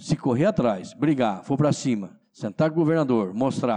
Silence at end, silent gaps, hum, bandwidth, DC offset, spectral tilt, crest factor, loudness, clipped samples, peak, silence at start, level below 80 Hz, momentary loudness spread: 0 s; none; none; 10 kHz; under 0.1%; -7 dB/octave; 12 dB; -23 LUFS; under 0.1%; -12 dBFS; 0 s; -60 dBFS; 8 LU